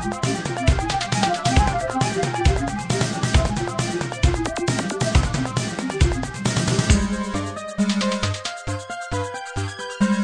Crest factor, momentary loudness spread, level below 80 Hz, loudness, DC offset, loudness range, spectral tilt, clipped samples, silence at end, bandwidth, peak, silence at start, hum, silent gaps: 18 dB; 8 LU; -28 dBFS; -22 LUFS; under 0.1%; 2 LU; -5 dB/octave; under 0.1%; 0 s; 10.5 kHz; -4 dBFS; 0 s; none; none